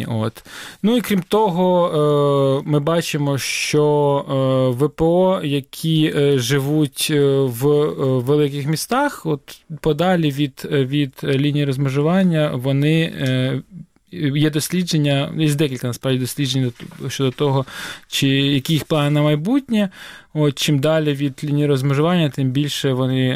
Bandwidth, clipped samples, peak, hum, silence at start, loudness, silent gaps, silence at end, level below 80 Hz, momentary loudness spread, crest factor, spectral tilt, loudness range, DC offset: 16 kHz; under 0.1%; -6 dBFS; none; 0 s; -18 LUFS; none; 0 s; -52 dBFS; 7 LU; 12 dB; -6 dB/octave; 3 LU; under 0.1%